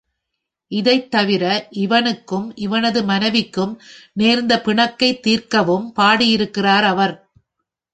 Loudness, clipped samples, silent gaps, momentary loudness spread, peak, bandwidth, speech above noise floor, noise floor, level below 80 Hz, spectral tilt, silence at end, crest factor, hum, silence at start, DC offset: -17 LUFS; under 0.1%; none; 9 LU; -2 dBFS; 9 kHz; 62 dB; -79 dBFS; -58 dBFS; -5 dB/octave; 0.75 s; 16 dB; none; 0.7 s; under 0.1%